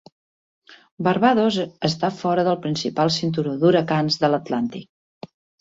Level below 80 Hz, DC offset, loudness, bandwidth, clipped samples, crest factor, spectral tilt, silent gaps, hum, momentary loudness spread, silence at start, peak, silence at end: -62 dBFS; under 0.1%; -21 LUFS; 8 kHz; under 0.1%; 18 dB; -6 dB/octave; 0.91-0.97 s; none; 8 LU; 0.7 s; -4 dBFS; 0.8 s